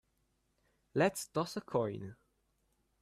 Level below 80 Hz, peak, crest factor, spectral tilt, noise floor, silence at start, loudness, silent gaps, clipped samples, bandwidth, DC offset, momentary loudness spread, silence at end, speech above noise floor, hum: -72 dBFS; -18 dBFS; 20 dB; -5 dB/octave; -78 dBFS; 0.95 s; -36 LUFS; none; under 0.1%; 15 kHz; under 0.1%; 12 LU; 0.85 s; 43 dB; none